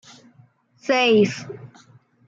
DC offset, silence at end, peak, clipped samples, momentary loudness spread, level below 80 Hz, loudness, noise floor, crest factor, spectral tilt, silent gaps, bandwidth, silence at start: under 0.1%; 0.6 s; -6 dBFS; under 0.1%; 22 LU; -72 dBFS; -18 LUFS; -56 dBFS; 16 dB; -5 dB/octave; none; 7.8 kHz; 0.85 s